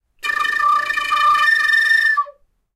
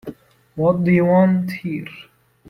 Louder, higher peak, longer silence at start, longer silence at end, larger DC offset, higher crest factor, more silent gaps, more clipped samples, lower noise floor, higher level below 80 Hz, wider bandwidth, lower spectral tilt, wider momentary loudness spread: first, -15 LUFS vs -18 LUFS; about the same, -6 dBFS vs -4 dBFS; first, 0.25 s vs 0.05 s; about the same, 0.45 s vs 0.45 s; neither; about the same, 12 dB vs 16 dB; neither; neither; first, -45 dBFS vs -38 dBFS; about the same, -54 dBFS vs -56 dBFS; first, 15.5 kHz vs 11.5 kHz; second, 1.5 dB/octave vs -9.5 dB/octave; second, 8 LU vs 22 LU